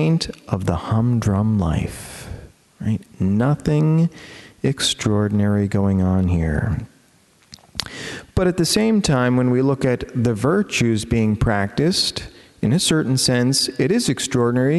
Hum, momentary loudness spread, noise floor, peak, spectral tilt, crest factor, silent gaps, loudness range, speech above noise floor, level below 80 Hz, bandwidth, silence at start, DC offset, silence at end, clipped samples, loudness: none; 12 LU; -55 dBFS; 0 dBFS; -5.5 dB/octave; 20 dB; none; 3 LU; 37 dB; -38 dBFS; 12.5 kHz; 0 s; under 0.1%; 0 s; under 0.1%; -19 LUFS